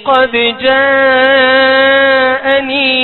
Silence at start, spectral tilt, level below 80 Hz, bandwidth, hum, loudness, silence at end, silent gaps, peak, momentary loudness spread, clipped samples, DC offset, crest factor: 0 s; -5.5 dB/octave; -48 dBFS; 4.4 kHz; none; -8 LUFS; 0 s; none; 0 dBFS; 4 LU; under 0.1%; under 0.1%; 10 dB